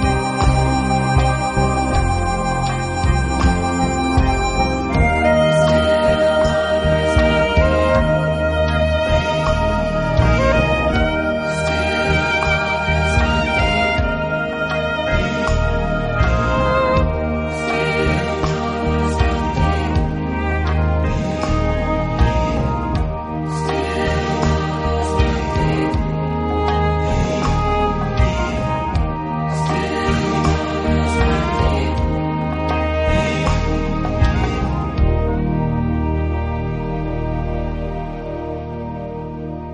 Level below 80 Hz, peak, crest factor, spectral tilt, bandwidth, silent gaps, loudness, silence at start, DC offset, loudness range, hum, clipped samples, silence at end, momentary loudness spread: -24 dBFS; -2 dBFS; 16 dB; -6.5 dB/octave; 10.5 kHz; none; -18 LUFS; 0 s; under 0.1%; 4 LU; none; under 0.1%; 0 s; 6 LU